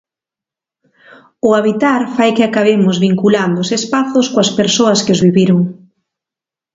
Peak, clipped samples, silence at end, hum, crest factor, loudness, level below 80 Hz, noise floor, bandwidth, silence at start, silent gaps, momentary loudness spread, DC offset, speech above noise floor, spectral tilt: 0 dBFS; under 0.1%; 1 s; none; 14 dB; -12 LUFS; -54 dBFS; -87 dBFS; 7.8 kHz; 1.45 s; none; 4 LU; under 0.1%; 75 dB; -5 dB/octave